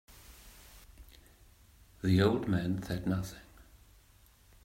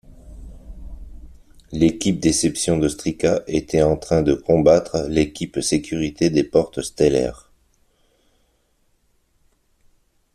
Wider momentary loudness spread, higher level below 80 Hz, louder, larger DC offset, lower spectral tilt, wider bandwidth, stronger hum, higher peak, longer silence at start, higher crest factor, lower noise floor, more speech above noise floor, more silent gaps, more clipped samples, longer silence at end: first, 27 LU vs 9 LU; second, -56 dBFS vs -42 dBFS; second, -32 LUFS vs -19 LUFS; neither; first, -7 dB/octave vs -5.5 dB/octave; first, 16 kHz vs 13.5 kHz; neither; second, -14 dBFS vs -2 dBFS; first, 0.3 s vs 0.1 s; about the same, 22 dB vs 18 dB; about the same, -62 dBFS vs -64 dBFS; second, 32 dB vs 45 dB; neither; neither; second, 1 s vs 3 s